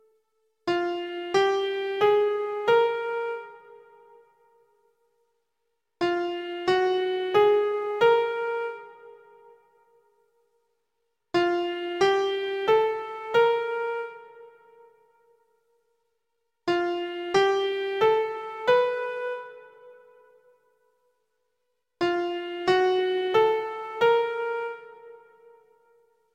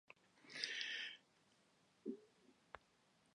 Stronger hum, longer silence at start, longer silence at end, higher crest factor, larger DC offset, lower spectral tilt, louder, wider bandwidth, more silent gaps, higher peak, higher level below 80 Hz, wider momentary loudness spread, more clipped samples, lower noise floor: neither; first, 0.65 s vs 0.35 s; first, 1.2 s vs 0.55 s; second, 18 dB vs 30 dB; neither; first, -4.5 dB/octave vs -1 dB/octave; first, -25 LUFS vs -48 LUFS; second, 9.4 kHz vs 10.5 kHz; neither; first, -10 dBFS vs -24 dBFS; first, -70 dBFS vs -90 dBFS; second, 12 LU vs 19 LU; neither; about the same, -80 dBFS vs -77 dBFS